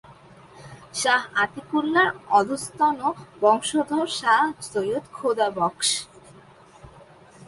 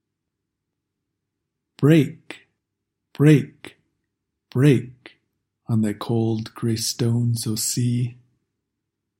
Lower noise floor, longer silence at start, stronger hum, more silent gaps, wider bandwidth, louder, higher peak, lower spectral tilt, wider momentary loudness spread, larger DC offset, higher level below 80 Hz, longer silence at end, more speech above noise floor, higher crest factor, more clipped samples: second, -50 dBFS vs -81 dBFS; second, 0.1 s vs 1.8 s; neither; neither; second, 11.5 kHz vs 16.5 kHz; about the same, -23 LUFS vs -21 LUFS; second, -6 dBFS vs -2 dBFS; second, -2.5 dB/octave vs -6 dB/octave; second, 8 LU vs 15 LU; neither; about the same, -64 dBFS vs -64 dBFS; second, 0.05 s vs 1.05 s; second, 27 dB vs 61 dB; about the same, 18 dB vs 20 dB; neither